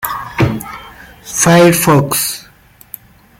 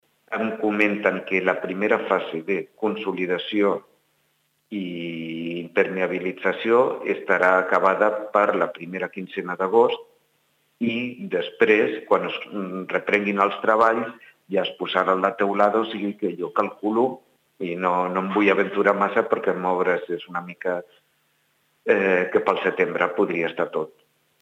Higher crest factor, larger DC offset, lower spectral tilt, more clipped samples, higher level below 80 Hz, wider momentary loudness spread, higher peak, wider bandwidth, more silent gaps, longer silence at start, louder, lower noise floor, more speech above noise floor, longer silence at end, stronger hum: about the same, 14 dB vs 18 dB; neither; second, -4.5 dB/octave vs -6.5 dB/octave; neither; first, -40 dBFS vs -76 dBFS; first, 25 LU vs 11 LU; first, 0 dBFS vs -4 dBFS; first, 17 kHz vs 9 kHz; neither; second, 0 s vs 0.3 s; first, -12 LUFS vs -23 LUFS; second, -44 dBFS vs -68 dBFS; second, 34 dB vs 46 dB; first, 0.95 s vs 0.5 s; neither